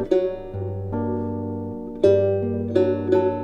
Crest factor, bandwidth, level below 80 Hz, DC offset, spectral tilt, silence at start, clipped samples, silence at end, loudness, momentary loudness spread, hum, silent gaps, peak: 18 dB; 6.8 kHz; -48 dBFS; under 0.1%; -9 dB/octave; 0 s; under 0.1%; 0 s; -23 LUFS; 12 LU; none; none; -4 dBFS